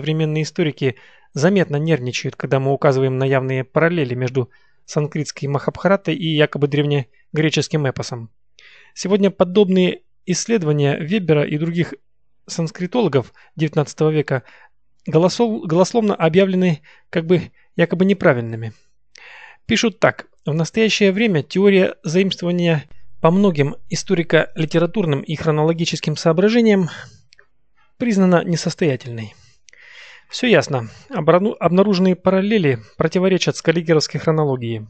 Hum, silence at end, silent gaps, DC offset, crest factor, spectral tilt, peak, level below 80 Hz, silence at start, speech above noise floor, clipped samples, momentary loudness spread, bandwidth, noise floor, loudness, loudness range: none; 0.05 s; none; 0.2%; 18 dB; -6 dB/octave; 0 dBFS; -56 dBFS; 0 s; 46 dB; under 0.1%; 10 LU; 8.8 kHz; -63 dBFS; -18 LUFS; 3 LU